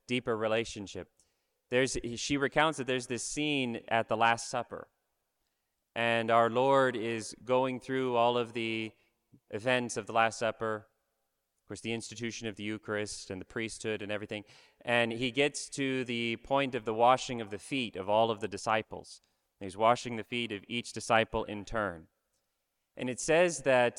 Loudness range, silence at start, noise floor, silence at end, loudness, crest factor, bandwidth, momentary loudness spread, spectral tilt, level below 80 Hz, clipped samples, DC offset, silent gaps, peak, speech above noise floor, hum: 5 LU; 0.1 s; -82 dBFS; 0 s; -31 LUFS; 20 dB; 12.5 kHz; 13 LU; -4 dB/octave; -62 dBFS; under 0.1%; under 0.1%; none; -12 dBFS; 51 dB; none